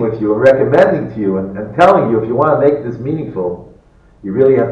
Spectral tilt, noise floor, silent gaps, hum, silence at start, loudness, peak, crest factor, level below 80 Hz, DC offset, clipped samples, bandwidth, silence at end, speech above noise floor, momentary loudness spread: -8.5 dB/octave; -45 dBFS; none; none; 0 s; -13 LUFS; 0 dBFS; 12 dB; -46 dBFS; under 0.1%; under 0.1%; 9 kHz; 0 s; 33 dB; 12 LU